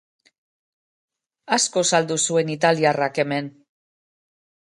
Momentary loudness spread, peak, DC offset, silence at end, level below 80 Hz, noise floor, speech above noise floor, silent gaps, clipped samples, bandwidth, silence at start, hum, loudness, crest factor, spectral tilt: 6 LU; -4 dBFS; under 0.1%; 1.2 s; -72 dBFS; under -90 dBFS; over 70 dB; none; under 0.1%; 11.5 kHz; 1.5 s; none; -20 LUFS; 20 dB; -3 dB/octave